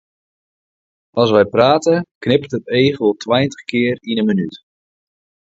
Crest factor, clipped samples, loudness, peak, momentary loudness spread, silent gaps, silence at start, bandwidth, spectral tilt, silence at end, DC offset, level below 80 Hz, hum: 18 dB; under 0.1%; -16 LUFS; 0 dBFS; 7 LU; 2.15-2.21 s; 1.15 s; 7.8 kHz; -6 dB/octave; 0.95 s; under 0.1%; -54 dBFS; none